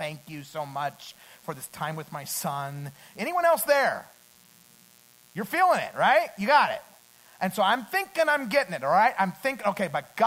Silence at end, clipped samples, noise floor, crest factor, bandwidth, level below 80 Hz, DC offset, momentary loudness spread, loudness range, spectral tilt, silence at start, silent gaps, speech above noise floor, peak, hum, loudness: 0 s; under 0.1%; -57 dBFS; 20 dB; 16 kHz; -72 dBFS; under 0.1%; 16 LU; 5 LU; -3.5 dB/octave; 0 s; none; 30 dB; -8 dBFS; none; -25 LUFS